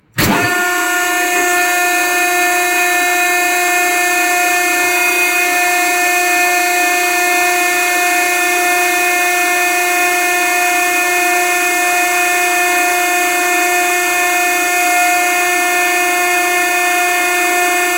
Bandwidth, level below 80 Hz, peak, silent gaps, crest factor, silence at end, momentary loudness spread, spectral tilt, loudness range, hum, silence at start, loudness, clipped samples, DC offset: 16.5 kHz; -52 dBFS; 0 dBFS; none; 14 dB; 0 s; 1 LU; -1 dB/octave; 0 LU; none; 0.15 s; -12 LUFS; under 0.1%; 0.2%